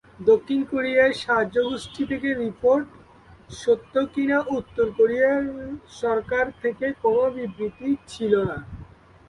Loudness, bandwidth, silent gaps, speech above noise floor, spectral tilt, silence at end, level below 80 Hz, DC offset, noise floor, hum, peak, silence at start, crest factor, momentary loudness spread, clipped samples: -23 LUFS; 11.5 kHz; none; 27 dB; -6 dB/octave; 0.45 s; -52 dBFS; under 0.1%; -50 dBFS; none; -6 dBFS; 0.2 s; 18 dB; 11 LU; under 0.1%